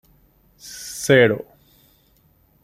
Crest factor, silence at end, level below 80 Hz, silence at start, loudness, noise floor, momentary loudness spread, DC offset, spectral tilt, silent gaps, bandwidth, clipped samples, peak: 22 dB; 1.2 s; -58 dBFS; 0.65 s; -18 LUFS; -59 dBFS; 23 LU; under 0.1%; -4.5 dB/octave; none; 16 kHz; under 0.1%; -2 dBFS